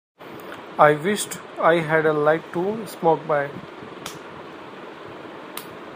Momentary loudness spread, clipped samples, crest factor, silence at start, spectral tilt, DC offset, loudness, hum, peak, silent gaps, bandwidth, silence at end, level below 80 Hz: 21 LU; under 0.1%; 24 dB; 0.2 s; -5 dB/octave; under 0.1%; -21 LUFS; none; 0 dBFS; none; 15.5 kHz; 0 s; -68 dBFS